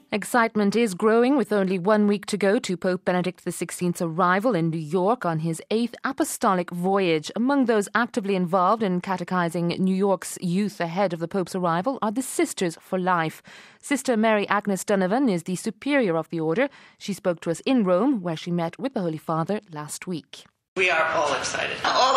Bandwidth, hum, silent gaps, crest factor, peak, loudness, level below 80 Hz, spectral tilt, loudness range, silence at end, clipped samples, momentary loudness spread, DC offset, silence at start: 15.5 kHz; none; 20.68-20.76 s; 20 dB; -2 dBFS; -24 LUFS; -68 dBFS; -5 dB/octave; 3 LU; 0 s; under 0.1%; 8 LU; under 0.1%; 0.1 s